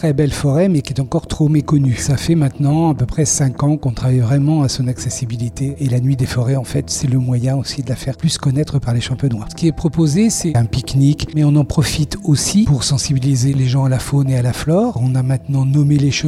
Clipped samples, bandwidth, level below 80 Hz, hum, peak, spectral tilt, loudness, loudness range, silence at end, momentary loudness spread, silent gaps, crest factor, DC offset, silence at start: under 0.1%; 14 kHz; -34 dBFS; none; -2 dBFS; -6 dB/octave; -16 LUFS; 3 LU; 0 s; 6 LU; none; 12 dB; under 0.1%; 0 s